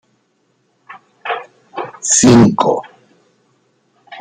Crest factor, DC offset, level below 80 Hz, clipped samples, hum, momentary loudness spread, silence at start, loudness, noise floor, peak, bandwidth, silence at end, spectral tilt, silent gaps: 16 dB; under 0.1%; -46 dBFS; under 0.1%; none; 20 LU; 0.9 s; -12 LUFS; -61 dBFS; 0 dBFS; 9.6 kHz; 0 s; -4.5 dB/octave; none